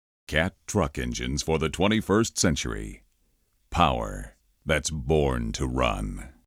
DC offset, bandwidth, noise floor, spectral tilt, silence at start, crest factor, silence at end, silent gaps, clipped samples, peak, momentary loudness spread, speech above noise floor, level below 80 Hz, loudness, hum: under 0.1%; 16 kHz; -68 dBFS; -4.5 dB/octave; 0.3 s; 20 dB; 0.15 s; none; under 0.1%; -8 dBFS; 13 LU; 42 dB; -38 dBFS; -26 LUFS; none